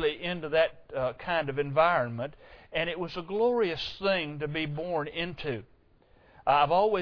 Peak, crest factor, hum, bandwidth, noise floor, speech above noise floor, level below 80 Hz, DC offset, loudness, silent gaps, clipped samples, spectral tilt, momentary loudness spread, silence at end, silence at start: -10 dBFS; 18 dB; none; 5.4 kHz; -61 dBFS; 32 dB; -56 dBFS; under 0.1%; -29 LUFS; none; under 0.1%; -7 dB/octave; 11 LU; 0 s; 0 s